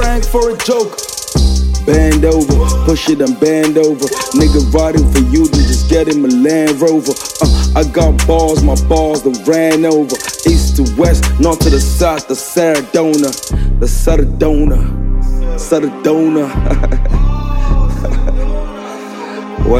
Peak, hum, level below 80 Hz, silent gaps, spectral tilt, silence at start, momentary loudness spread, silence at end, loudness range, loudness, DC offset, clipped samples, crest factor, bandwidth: 0 dBFS; none; -14 dBFS; none; -5.5 dB/octave; 0 s; 8 LU; 0 s; 4 LU; -12 LUFS; under 0.1%; under 0.1%; 10 dB; 16 kHz